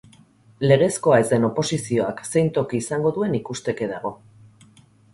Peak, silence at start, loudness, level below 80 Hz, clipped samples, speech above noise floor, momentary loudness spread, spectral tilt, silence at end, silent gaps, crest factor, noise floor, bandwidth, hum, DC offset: -2 dBFS; 0.6 s; -21 LUFS; -56 dBFS; under 0.1%; 32 dB; 10 LU; -5.5 dB/octave; 1 s; none; 20 dB; -53 dBFS; 11.5 kHz; none; under 0.1%